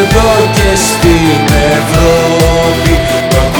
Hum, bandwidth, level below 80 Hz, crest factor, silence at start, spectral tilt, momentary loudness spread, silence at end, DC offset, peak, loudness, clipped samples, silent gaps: none; over 20 kHz; -16 dBFS; 8 dB; 0 s; -4.5 dB/octave; 2 LU; 0 s; under 0.1%; 0 dBFS; -8 LUFS; under 0.1%; none